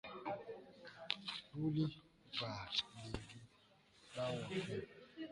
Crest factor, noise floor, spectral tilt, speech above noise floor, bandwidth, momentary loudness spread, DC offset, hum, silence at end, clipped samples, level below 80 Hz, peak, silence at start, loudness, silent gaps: 28 dB; -70 dBFS; -5.5 dB/octave; 27 dB; 11 kHz; 16 LU; under 0.1%; none; 0 s; under 0.1%; -68 dBFS; -16 dBFS; 0.05 s; -44 LUFS; none